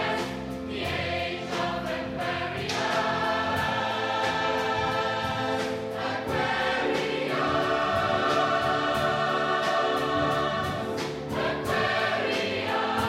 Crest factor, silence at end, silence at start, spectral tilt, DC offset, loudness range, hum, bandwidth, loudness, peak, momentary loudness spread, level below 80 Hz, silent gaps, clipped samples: 14 dB; 0 s; 0 s; -4.5 dB/octave; under 0.1%; 3 LU; none; 16 kHz; -27 LUFS; -12 dBFS; 6 LU; -52 dBFS; none; under 0.1%